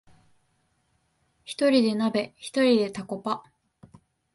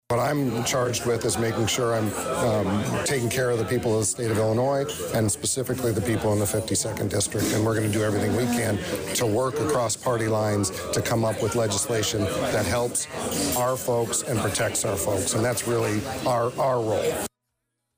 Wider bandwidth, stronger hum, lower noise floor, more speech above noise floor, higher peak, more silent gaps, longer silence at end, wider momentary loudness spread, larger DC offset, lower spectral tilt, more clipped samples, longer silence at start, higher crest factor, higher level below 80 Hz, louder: second, 11.5 kHz vs 16 kHz; neither; second, -71 dBFS vs -80 dBFS; second, 46 dB vs 55 dB; first, -8 dBFS vs -14 dBFS; neither; first, 0.95 s vs 0.7 s; first, 12 LU vs 3 LU; neither; about the same, -5 dB/octave vs -4.5 dB/octave; neither; first, 1.5 s vs 0.1 s; first, 18 dB vs 10 dB; second, -70 dBFS vs -50 dBFS; about the same, -25 LUFS vs -24 LUFS